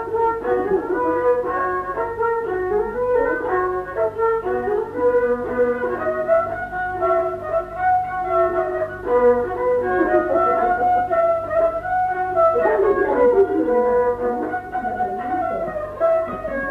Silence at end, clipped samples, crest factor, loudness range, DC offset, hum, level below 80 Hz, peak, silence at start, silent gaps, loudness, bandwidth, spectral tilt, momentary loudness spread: 0 s; under 0.1%; 14 dB; 3 LU; under 0.1%; 50 Hz at -50 dBFS; -46 dBFS; -6 dBFS; 0 s; none; -20 LUFS; 5 kHz; -8 dB/octave; 7 LU